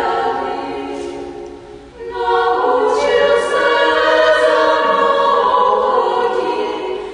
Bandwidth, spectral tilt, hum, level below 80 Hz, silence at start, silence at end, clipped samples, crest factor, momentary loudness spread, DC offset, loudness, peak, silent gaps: 10.5 kHz; -3.5 dB/octave; none; -48 dBFS; 0 s; 0 s; under 0.1%; 14 dB; 15 LU; under 0.1%; -14 LUFS; -2 dBFS; none